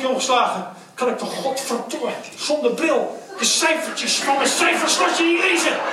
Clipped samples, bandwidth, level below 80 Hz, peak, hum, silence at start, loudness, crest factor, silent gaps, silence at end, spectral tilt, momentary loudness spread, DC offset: under 0.1%; 16 kHz; -80 dBFS; -4 dBFS; none; 0 s; -19 LUFS; 16 dB; none; 0 s; -1.5 dB/octave; 10 LU; under 0.1%